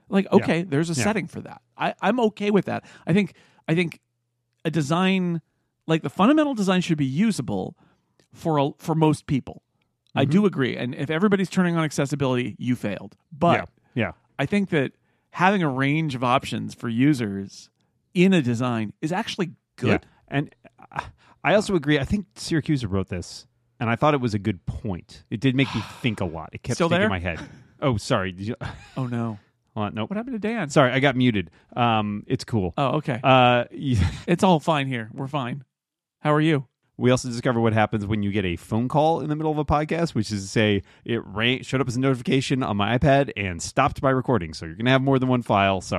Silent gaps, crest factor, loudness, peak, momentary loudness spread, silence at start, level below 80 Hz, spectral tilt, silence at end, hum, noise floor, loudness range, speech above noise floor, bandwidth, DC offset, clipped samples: none; 20 dB; -23 LUFS; -4 dBFS; 12 LU; 0.1 s; -48 dBFS; -6 dB/octave; 0 s; none; -87 dBFS; 4 LU; 64 dB; 13 kHz; under 0.1%; under 0.1%